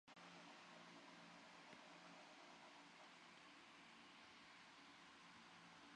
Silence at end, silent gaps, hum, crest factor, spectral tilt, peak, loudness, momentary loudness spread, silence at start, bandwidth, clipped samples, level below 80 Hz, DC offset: 0 s; none; none; 18 dB; -3 dB/octave; -46 dBFS; -63 LUFS; 2 LU; 0.05 s; 10 kHz; under 0.1%; under -90 dBFS; under 0.1%